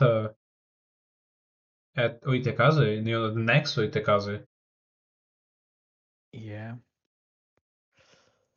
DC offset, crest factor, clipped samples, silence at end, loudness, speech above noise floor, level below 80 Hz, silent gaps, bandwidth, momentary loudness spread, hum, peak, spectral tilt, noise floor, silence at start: under 0.1%; 20 dB; under 0.1%; 1.8 s; -26 LUFS; 39 dB; -68 dBFS; 0.36-1.93 s, 4.46-6.32 s; 7 kHz; 18 LU; none; -10 dBFS; -5 dB/octave; -64 dBFS; 0 s